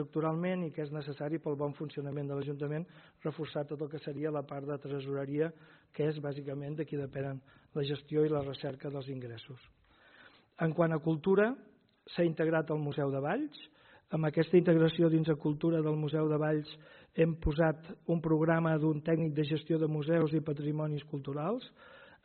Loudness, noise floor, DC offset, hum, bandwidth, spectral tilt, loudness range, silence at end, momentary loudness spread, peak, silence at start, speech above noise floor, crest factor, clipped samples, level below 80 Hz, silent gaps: -33 LUFS; -61 dBFS; under 0.1%; none; 4.5 kHz; -7 dB/octave; 8 LU; 0.2 s; 12 LU; -14 dBFS; 0 s; 28 dB; 18 dB; under 0.1%; -56 dBFS; none